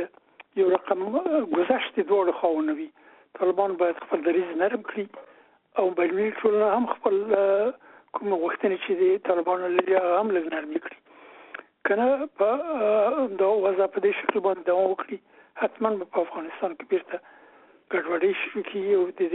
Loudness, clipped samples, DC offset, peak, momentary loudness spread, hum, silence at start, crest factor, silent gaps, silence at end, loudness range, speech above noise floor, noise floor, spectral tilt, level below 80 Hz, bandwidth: -25 LUFS; under 0.1%; under 0.1%; -4 dBFS; 10 LU; none; 0 s; 22 dB; none; 0 s; 4 LU; 30 dB; -55 dBFS; -3.5 dB/octave; -74 dBFS; 4 kHz